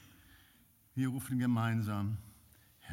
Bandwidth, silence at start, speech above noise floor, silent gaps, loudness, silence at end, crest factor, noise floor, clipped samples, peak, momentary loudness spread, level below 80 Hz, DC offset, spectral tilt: 16.5 kHz; 0.95 s; 32 dB; none; -36 LUFS; 0 s; 16 dB; -66 dBFS; under 0.1%; -22 dBFS; 13 LU; -70 dBFS; under 0.1%; -7 dB/octave